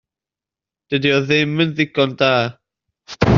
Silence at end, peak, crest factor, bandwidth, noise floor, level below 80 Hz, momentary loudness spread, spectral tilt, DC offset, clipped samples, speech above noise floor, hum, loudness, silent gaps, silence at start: 0 s; 0 dBFS; 18 dB; 7.2 kHz; -89 dBFS; -40 dBFS; 8 LU; -4 dB/octave; under 0.1%; under 0.1%; 72 dB; none; -17 LUFS; none; 0.9 s